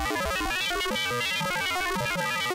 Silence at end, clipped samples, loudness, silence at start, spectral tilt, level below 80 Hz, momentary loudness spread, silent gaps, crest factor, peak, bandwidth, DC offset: 0 s; under 0.1%; -27 LUFS; 0 s; -2.5 dB/octave; -44 dBFS; 1 LU; none; 10 dB; -18 dBFS; 16 kHz; under 0.1%